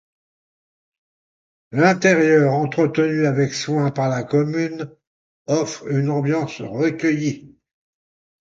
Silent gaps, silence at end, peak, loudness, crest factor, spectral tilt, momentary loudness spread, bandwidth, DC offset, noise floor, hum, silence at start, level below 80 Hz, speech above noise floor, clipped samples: 5.07-5.45 s; 1 s; 0 dBFS; -19 LUFS; 20 dB; -6.5 dB/octave; 12 LU; 7.8 kHz; under 0.1%; under -90 dBFS; none; 1.7 s; -62 dBFS; over 71 dB; under 0.1%